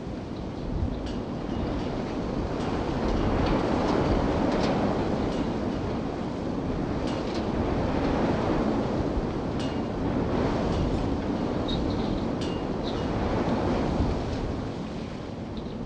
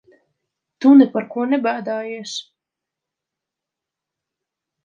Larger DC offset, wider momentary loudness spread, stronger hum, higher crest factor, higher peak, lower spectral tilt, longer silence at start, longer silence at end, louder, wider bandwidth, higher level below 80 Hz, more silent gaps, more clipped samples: neither; second, 7 LU vs 17 LU; neither; about the same, 16 dB vs 18 dB; second, -12 dBFS vs -2 dBFS; first, -7.5 dB/octave vs -5 dB/octave; second, 0 s vs 0.8 s; second, 0 s vs 2.45 s; second, -28 LUFS vs -17 LUFS; first, 9.6 kHz vs 7.4 kHz; first, -36 dBFS vs -72 dBFS; neither; neither